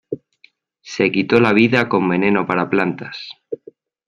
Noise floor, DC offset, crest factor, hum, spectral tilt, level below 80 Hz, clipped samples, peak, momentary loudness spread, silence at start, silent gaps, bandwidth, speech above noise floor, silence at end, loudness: -55 dBFS; under 0.1%; 18 dB; none; -6.5 dB/octave; -58 dBFS; under 0.1%; -2 dBFS; 18 LU; 0.1 s; none; 11 kHz; 38 dB; 0.55 s; -16 LUFS